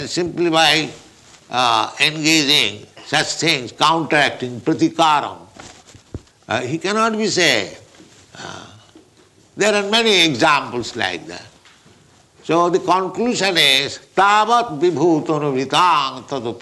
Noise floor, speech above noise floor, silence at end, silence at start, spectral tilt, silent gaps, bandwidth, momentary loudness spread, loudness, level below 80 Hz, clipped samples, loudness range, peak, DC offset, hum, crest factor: -52 dBFS; 34 dB; 0 s; 0 s; -3 dB/octave; none; 12 kHz; 17 LU; -16 LUFS; -56 dBFS; under 0.1%; 5 LU; -2 dBFS; under 0.1%; none; 16 dB